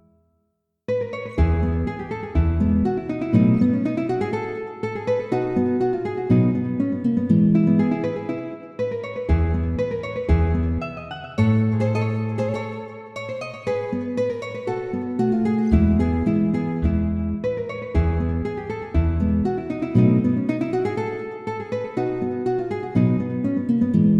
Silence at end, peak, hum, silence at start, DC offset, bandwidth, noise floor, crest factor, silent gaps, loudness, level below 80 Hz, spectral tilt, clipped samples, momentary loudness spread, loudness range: 0 s; -4 dBFS; none; 0.9 s; under 0.1%; 7.8 kHz; -73 dBFS; 18 dB; none; -22 LUFS; -32 dBFS; -9.5 dB/octave; under 0.1%; 11 LU; 3 LU